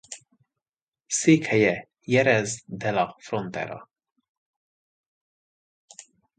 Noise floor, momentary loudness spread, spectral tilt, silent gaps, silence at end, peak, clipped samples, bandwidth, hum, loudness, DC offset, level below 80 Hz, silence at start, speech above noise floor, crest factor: under -90 dBFS; 15 LU; -4.5 dB/octave; 0.69-0.73 s, 0.82-0.92 s; 2.55 s; -6 dBFS; under 0.1%; 9.6 kHz; none; -24 LUFS; under 0.1%; -64 dBFS; 0.1 s; over 67 dB; 22 dB